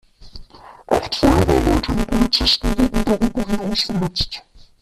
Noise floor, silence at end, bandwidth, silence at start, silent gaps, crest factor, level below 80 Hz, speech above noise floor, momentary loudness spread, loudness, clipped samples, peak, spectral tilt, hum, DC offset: -41 dBFS; 0.4 s; 14.5 kHz; 0.2 s; none; 18 dB; -28 dBFS; 22 dB; 7 LU; -18 LUFS; under 0.1%; -2 dBFS; -5 dB/octave; none; under 0.1%